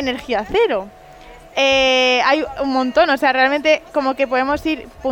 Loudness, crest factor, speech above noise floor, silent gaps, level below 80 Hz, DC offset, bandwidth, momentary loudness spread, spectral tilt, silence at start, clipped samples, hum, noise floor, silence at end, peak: -16 LUFS; 14 dB; 24 dB; none; -44 dBFS; under 0.1%; 17 kHz; 10 LU; -3 dB/octave; 0 s; under 0.1%; none; -40 dBFS; 0 s; -2 dBFS